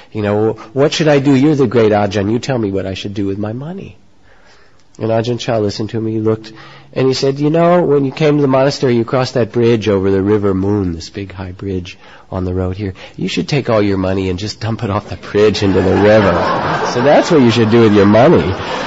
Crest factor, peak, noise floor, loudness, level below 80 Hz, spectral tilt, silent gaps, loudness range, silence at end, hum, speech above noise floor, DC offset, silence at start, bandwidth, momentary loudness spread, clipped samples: 12 dB; 0 dBFS; -48 dBFS; -13 LUFS; -36 dBFS; -6.5 dB/octave; none; 9 LU; 0 s; none; 35 dB; 0.6%; 0.15 s; 8 kHz; 13 LU; under 0.1%